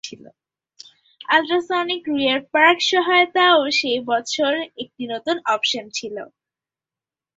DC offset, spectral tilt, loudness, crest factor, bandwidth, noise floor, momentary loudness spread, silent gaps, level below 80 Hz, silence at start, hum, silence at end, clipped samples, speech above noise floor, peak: under 0.1%; -2 dB/octave; -18 LUFS; 20 dB; 8 kHz; under -90 dBFS; 16 LU; none; -66 dBFS; 0.05 s; none; 1.1 s; under 0.1%; over 70 dB; 0 dBFS